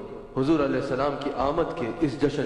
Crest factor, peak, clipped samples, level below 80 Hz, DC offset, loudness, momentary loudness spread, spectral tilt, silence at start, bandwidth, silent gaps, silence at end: 16 dB; -10 dBFS; under 0.1%; -46 dBFS; under 0.1%; -26 LUFS; 5 LU; -7 dB/octave; 0 s; 10.5 kHz; none; 0 s